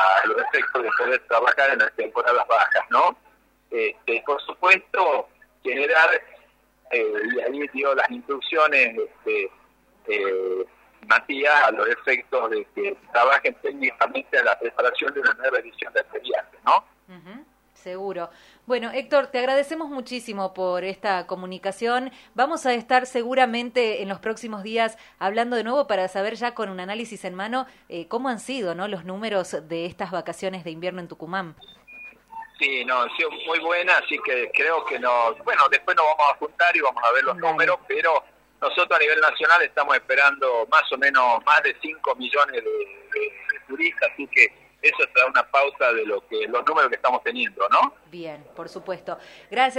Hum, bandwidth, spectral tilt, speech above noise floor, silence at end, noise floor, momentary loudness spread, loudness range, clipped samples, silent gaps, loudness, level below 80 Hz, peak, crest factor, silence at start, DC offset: none; 15.5 kHz; -3.5 dB/octave; 36 dB; 0 s; -58 dBFS; 14 LU; 8 LU; under 0.1%; none; -22 LUFS; -68 dBFS; -2 dBFS; 22 dB; 0 s; under 0.1%